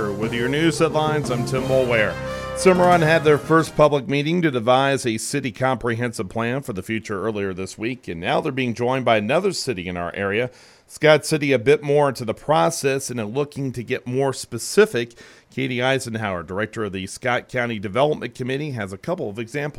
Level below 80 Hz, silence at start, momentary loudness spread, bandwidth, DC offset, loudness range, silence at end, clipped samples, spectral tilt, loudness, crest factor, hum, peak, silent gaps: -50 dBFS; 0 s; 11 LU; 16 kHz; under 0.1%; 7 LU; 0.1 s; under 0.1%; -5 dB/octave; -21 LUFS; 18 dB; none; -2 dBFS; none